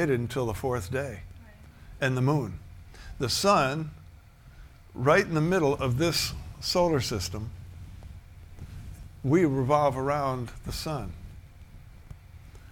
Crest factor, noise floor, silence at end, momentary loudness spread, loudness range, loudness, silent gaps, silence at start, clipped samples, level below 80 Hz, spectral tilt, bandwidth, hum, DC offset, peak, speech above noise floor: 20 dB; -51 dBFS; 0 s; 23 LU; 4 LU; -27 LUFS; none; 0 s; under 0.1%; -46 dBFS; -5 dB/octave; 18 kHz; none; under 0.1%; -8 dBFS; 24 dB